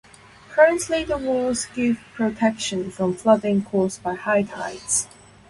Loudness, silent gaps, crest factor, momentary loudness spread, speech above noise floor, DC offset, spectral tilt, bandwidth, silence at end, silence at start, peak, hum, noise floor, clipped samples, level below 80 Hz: -22 LUFS; none; 20 dB; 9 LU; 25 dB; under 0.1%; -4 dB/octave; 11.5 kHz; 0.45 s; 0.5 s; -2 dBFS; none; -47 dBFS; under 0.1%; -52 dBFS